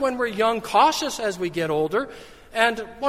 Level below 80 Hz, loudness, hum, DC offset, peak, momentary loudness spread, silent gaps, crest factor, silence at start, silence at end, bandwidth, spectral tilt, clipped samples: -54 dBFS; -22 LUFS; none; under 0.1%; -4 dBFS; 8 LU; none; 20 dB; 0 s; 0 s; 16 kHz; -3.5 dB/octave; under 0.1%